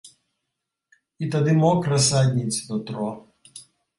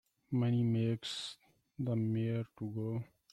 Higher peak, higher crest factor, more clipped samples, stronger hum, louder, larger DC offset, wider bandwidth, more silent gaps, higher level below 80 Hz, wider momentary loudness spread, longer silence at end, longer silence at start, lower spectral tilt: first, -8 dBFS vs -24 dBFS; about the same, 16 dB vs 12 dB; neither; neither; first, -22 LUFS vs -36 LUFS; neither; about the same, 11.5 kHz vs 10.5 kHz; neither; first, -58 dBFS vs -70 dBFS; first, 13 LU vs 10 LU; about the same, 0.4 s vs 0.3 s; second, 0.05 s vs 0.3 s; second, -5 dB/octave vs -7 dB/octave